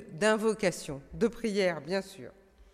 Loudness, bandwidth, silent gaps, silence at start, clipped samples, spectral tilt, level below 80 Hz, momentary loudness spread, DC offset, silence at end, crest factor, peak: -30 LUFS; 15.5 kHz; none; 0 s; under 0.1%; -4.5 dB/octave; -58 dBFS; 18 LU; under 0.1%; 0.1 s; 18 dB; -14 dBFS